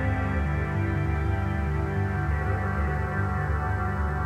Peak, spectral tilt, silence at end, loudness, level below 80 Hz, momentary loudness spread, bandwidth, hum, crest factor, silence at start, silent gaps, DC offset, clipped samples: -14 dBFS; -8.5 dB/octave; 0 s; -27 LUFS; -32 dBFS; 1 LU; 8.4 kHz; none; 12 dB; 0 s; none; under 0.1%; under 0.1%